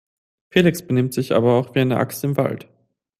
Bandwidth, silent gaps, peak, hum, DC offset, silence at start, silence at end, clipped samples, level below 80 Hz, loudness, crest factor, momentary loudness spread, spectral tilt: 15.5 kHz; none; -2 dBFS; none; under 0.1%; 0.55 s; 0.6 s; under 0.1%; -56 dBFS; -20 LUFS; 18 dB; 5 LU; -6.5 dB/octave